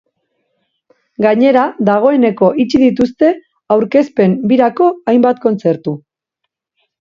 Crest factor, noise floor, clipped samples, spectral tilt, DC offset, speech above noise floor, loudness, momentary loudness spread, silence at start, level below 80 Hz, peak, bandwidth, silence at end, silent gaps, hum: 12 dB; -75 dBFS; under 0.1%; -8 dB/octave; under 0.1%; 64 dB; -12 LUFS; 5 LU; 1.2 s; -54 dBFS; 0 dBFS; 7.2 kHz; 1.05 s; none; none